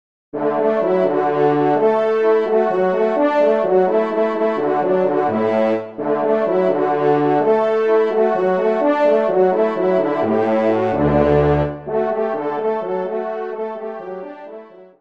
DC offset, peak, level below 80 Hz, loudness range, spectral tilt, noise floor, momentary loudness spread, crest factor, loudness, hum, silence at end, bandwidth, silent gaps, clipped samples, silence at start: 0.3%; -2 dBFS; -44 dBFS; 3 LU; -8.5 dB/octave; -38 dBFS; 8 LU; 14 dB; -17 LUFS; none; 0.15 s; 6.2 kHz; none; under 0.1%; 0.35 s